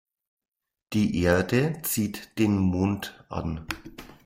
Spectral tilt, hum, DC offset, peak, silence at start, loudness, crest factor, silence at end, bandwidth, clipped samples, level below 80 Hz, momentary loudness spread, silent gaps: -5.5 dB/octave; none; under 0.1%; -10 dBFS; 0.9 s; -26 LUFS; 18 dB; 0.1 s; 16 kHz; under 0.1%; -52 dBFS; 12 LU; none